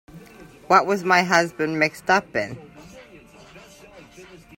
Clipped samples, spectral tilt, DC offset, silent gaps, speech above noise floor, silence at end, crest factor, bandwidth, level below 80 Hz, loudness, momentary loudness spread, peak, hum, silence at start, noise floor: under 0.1%; -4 dB/octave; under 0.1%; none; 27 dB; 0.2 s; 22 dB; 16.5 kHz; -60 dBFS; -20 LUFS; 11 LU; -2 dBFS; none; 0.15 s; -47 dBFS